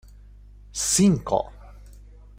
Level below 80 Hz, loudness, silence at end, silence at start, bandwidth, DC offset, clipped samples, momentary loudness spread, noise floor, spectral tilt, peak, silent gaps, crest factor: -44 dBFS; -22 LUFS; 0.65 s; 0.75 s; 16 kHz; under 0.1%; under 0.1%; 17 LU; -46 dBFS; -4.5 dB/octave; -8 dBFS; none; 18 dB